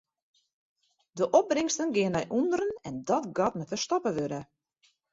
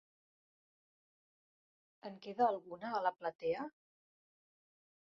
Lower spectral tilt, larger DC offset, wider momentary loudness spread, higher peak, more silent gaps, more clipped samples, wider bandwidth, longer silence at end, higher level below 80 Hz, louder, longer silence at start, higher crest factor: first, -4.5 dB/octave vs -3 dB/octave; neither; second, 10 LU vs 15 LU; first, -10 dBFS vs -20 dBFS; second, none vs 3.35-3.39 s; neither; first, 8 kHz vs 6.6 kHz; second, 0.7 s vs 1.45 s; first, -66 dBFS vs -84 dBFS; first, -29 LUFS vs -38 LUFS; second, 1.15 s vs 2.05 s; about the same, 20 dB vs 22 dB